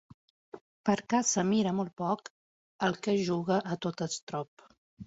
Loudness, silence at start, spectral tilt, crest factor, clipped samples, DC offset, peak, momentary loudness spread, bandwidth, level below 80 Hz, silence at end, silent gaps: -31 LUFS; 0.55 s; -4.5 dB/octave; 20 dB; under 0.1%; under 0.1%; -12 dBFS; 10 LU; 8 kHz; -70 dBFS; 0 s; 0.61-0.84 s, 1.93-1.97 s, 2.30-2.79 s, 4.22-4.27 s, 4.48-4.57 s, 4.78-4.97 s